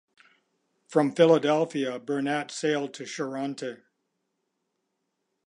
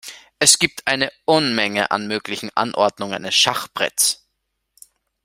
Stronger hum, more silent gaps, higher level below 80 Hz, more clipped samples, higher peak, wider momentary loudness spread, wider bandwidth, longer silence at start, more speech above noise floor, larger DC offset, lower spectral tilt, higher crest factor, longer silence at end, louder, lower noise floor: neither; neither; second, -84 dBFS vs -60 dBFS; neither; second, -6 dBFS vs 0 dBFS; first, 14 LU vs 11 LU; second, 11 kHz vs 16 kHz; first, 0.9 s vs 0.05 s; about the same, 54 dB vs 55 dB; neither; first, -5 dB/octave vs -1.5 dB/octave; about the same, 22 dB vs 20 dB; first, 1.7 s vs 1.1 s; second, -26 LUFS vs -18 LUFS; first, -79 dBFS vs -75 dBFS